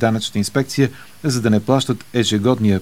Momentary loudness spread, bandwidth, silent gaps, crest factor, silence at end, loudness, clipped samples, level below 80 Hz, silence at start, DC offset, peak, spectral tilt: 5 LU; over 20 kHz; none; 16 dB; 0 s; -18 LUFS; under 0.1%; -54 dBFS; 0 s; 0.8%; 0 dBFS; -5.5 dB/octave